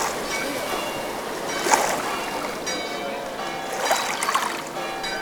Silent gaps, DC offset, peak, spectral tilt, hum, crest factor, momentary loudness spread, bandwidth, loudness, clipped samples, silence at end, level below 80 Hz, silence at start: none; under 0.1%; -2 dBFS; -1.5 dB/octave; none; 24 dB; 9 LU; over 20 kHz; -25 LUFS; under 0.1%; 0 s; -54 dBFS; 0 s